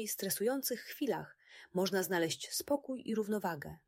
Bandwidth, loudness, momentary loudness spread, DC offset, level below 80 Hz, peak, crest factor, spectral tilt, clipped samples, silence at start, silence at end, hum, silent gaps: 16.5 kHz; -36 LUFS; 7 LU; under 0.1%; -72 dBFS; -22 dBFS; 16 dB; -3.5 dB/octave; under 0.1%; 0 s; 0.1 s; none; none